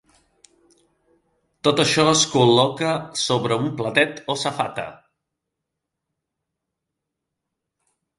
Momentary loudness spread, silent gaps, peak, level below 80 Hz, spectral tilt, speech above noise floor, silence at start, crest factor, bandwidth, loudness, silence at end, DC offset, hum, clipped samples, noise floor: 10 LU; none; 0 dBFS; -62 dBFS; -3.5 dB/octave; 62 dB; 1.65 s; 24 dB; 11.5 kHz; -19 LUFS; 3.25 s; under 0.1%; none; under 0.1%; -82 dBFS